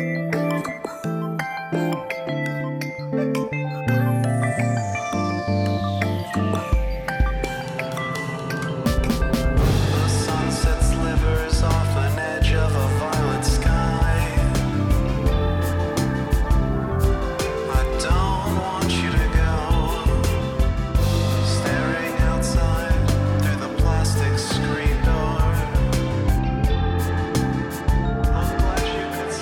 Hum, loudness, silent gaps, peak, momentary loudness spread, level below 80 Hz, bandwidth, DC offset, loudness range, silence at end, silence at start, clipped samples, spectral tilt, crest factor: none; -22 LUFS; none; -10 dBFS; 6 LU; -24 dBFS; 17 kHz; under 0.1%; 3 LU; 0 s; 0 s; under 0.1%; -6 dB/octave; 10 dB